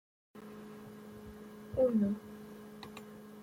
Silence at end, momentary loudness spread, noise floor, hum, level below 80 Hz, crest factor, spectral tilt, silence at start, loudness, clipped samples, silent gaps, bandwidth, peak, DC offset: 0 s; 20 LU; -50 dBFS; none; -66 dBFS; 18 dB; -8 dB/octave; 0.35 s; -33 LUFS; under 0.1%; none; 16.5 kHz; -20 dBFS; under 0.1%